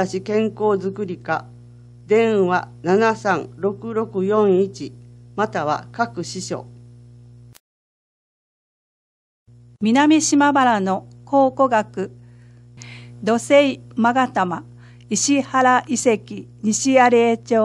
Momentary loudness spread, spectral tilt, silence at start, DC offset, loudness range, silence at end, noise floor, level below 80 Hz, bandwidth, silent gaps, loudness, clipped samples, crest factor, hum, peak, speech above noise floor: 14 LU; -4.5 dB/octave; 0 s; under 0.1%; 9 LU; 0 s; -45 dBFS; -58 dBFS; 12 kHz; 7.60-9.46 s; -19 LUFS; under 0.1%; 18 dB; 60 Hz at -45 dBFS; -2 dBFS; 27 dB